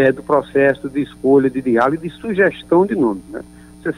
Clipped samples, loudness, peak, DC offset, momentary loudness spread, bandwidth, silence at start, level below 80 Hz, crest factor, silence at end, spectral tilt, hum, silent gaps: under 0.1%; -16 LUFS; -2 dBFS; under 0.1%; 12 LU; 10.5 kHz; 0 s; -48 dBFS; 14 dB; 0.05 s; -7.5 dB/octave; none; none